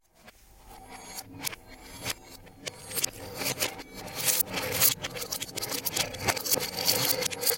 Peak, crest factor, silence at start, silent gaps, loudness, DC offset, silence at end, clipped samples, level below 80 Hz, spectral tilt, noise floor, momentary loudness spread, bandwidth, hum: -6 dBFS; 26 dB; 0.25 s; none; -28 LUFS; under 0.1%; 0 s; under 0.1%; -58 dBFS; -1 dB/octave; -56 dBFS; 18 LU; 17 kHz; none